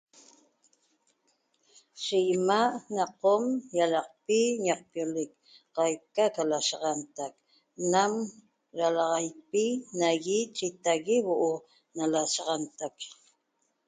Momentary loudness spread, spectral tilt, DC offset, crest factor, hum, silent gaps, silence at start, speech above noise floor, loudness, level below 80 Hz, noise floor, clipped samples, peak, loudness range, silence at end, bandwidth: 13 LU; -3.5 dB/octave; under 0.1%; 20 dB; none; none; 1.95 s; 48 dB; -29 LUFS; -80 dBFS; -76 dBFS; under 0.1%; -10 dBFS; 3 LU; 0.75 s; 9.6 kHz